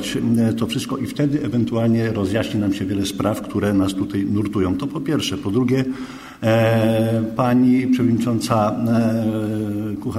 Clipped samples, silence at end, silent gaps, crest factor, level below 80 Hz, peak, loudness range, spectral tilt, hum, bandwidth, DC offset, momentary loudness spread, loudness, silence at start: under 0.1%; 0 s; none; 16 dB; -50 dBFS; -4 dBFS; 3 LU; -6.5 dB/octave; none; 15.5 kHz; under 0.1%; 7 LU; -20 LUFS; 0 s